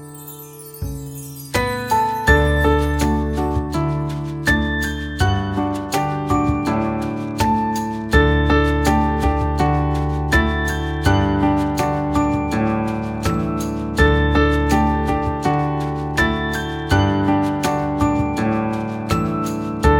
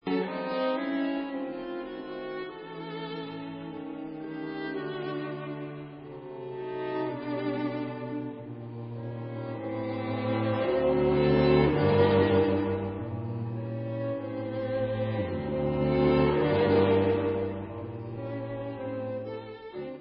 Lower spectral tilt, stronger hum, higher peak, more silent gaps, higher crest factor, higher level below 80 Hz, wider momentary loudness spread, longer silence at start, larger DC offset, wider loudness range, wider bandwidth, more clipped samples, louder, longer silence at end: second, -6 dB/octave vs -11 dB/octave; neither; first, -2 dBFS vs -10 dBFS; neither; about the same, 18 dB vs 18 dB; first, -26 dBFS vs -50 dBFS; second, 8 LU vs 16 LU; about the same, 0 s vs 0.05 s; neither; second, 2 LU vs 12 LU; first, 17.5 kHz vs 5.6 kHz; neither; first, -19 LUFS vs -30 LUFS; about the same, 0 s vs 0 s